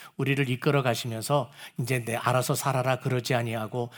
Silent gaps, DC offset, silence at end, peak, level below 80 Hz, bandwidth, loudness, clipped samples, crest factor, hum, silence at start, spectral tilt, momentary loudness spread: none; under 0.1%; 0 s; -8 dBFS; -70 dBFS; over 20 kHz; -27 LUFS; under 0.1%; 18 dB; none; 0 s; -5 dB/octave; 6 LU